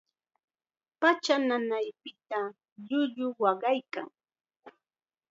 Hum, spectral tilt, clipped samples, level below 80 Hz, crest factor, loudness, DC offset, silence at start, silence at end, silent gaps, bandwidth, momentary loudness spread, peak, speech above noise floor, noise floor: none; -3.5 dB/octave; under 0.1%; -90 dBFS; 22 dB; -30 LUFS; under 0.1%; 1 s; 0.6 s; 2.72-2.76 s; 7.8 kHz; 14 LU; -10 dBFS; over 61 dB; under -90 dBFS